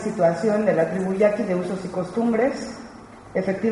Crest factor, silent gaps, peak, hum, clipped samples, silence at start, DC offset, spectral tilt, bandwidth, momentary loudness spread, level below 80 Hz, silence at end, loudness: 16 dB; none; -6 dBFS; none; under 0.1%; 0 s; under 0.1%; -7 dB/octave; 11.5 kHz; 14 LU; -56 dBFS; 0 s; -23 LUFS